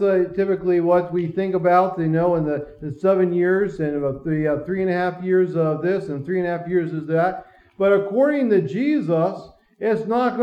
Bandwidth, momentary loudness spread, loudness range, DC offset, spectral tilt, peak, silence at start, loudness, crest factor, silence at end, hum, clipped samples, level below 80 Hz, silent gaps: 5.6 kHz; 6 LU; 2 LU; under 0.1%; -9.5 dB/octave; -4 dBFS; 0 s; -21 LUFS; 16 dB; 0 s; none; under 0.1%; -54 dBFS; none